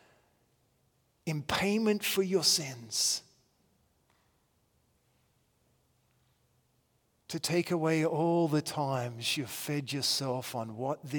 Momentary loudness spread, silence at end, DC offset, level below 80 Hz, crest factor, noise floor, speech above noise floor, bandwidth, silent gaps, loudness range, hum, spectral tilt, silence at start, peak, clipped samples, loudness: 10 LU; 0 s; under 0.1%; -70 dBFS; 22 dB; -73 dBFS; 42 dB; 18 kHz; none; 7 LU; none; -3.5 dB/octave; 1.25 s; -12 dBFS; under 0.1%; -31 LUFS